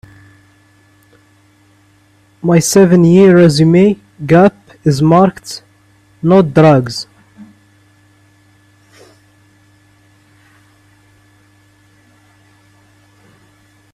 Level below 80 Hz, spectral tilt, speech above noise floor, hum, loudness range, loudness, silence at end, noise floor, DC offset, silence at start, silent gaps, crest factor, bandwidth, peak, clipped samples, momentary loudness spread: -50 dBFS; -6.5 dB/octave; 42 dB; none; 6 LU; -10 LUFS; 6.5 s; -50 dBFS; under 0.1%; 2.45 s; none; 14 dB; 14.5 kHz; 0 dBFS; under 0.1%; 17 LU